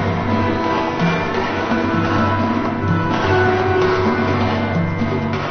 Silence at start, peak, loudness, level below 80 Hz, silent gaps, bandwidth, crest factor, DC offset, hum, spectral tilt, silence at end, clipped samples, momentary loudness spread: 0 s; -4 dBFS; -18 LUFS; -36 dBFS; none; 6.6 kHz; 14 dB; under 0.1%; none; -7 dB/octave; 0 s; under 0.1%; 4 LU